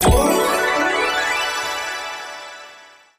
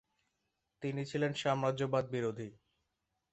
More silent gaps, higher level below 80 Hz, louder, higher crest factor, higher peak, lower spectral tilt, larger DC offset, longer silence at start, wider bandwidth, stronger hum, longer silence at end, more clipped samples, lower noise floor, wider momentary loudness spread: neither; first, -30 dBFS vs -74 dBFS; first, -19 LUFS vs -36 LUFS; about the same, 16 dB vs 20 dB; first, -4 dBFS vs -18 dBFS; second, -3.5 dB/octave vs -6 dB/octave; neither; second, 0 s vs 0.8 s; first, 15.5 kHz vs 8.2 kHz; neither; second, 0.35 s vs 0.8 s; neither; second, -45 dBFS vs -85 dBFS; first, 18 LU vs 10 LU